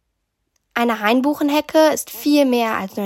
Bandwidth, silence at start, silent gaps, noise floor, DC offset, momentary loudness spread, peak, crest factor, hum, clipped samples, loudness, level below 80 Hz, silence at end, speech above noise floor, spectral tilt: 16.5 kHz; 0.75 s; none; -73 dBFS; under 0.1%; 6 LU; -4 dBFS; 16 dB; none; under 0.1%; -18 LUFS; -62 dBFS; 0 s; 56 dB; -3.5 dB/octave